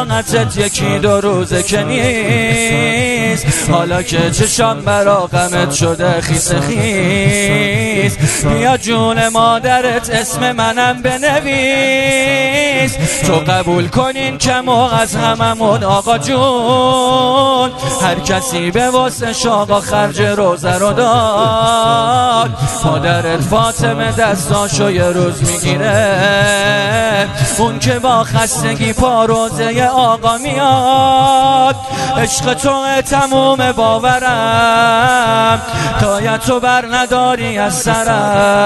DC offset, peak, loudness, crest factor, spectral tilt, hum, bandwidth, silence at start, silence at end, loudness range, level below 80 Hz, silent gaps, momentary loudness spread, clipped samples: under 0.1%; 0 dBFS; -12 LUFS; 12 dB; -4 dB/octave; none; 12.5 kHz; 0 s; 0 s; 1 LU; -34 dBFS; none; 4 LU; under 0.1%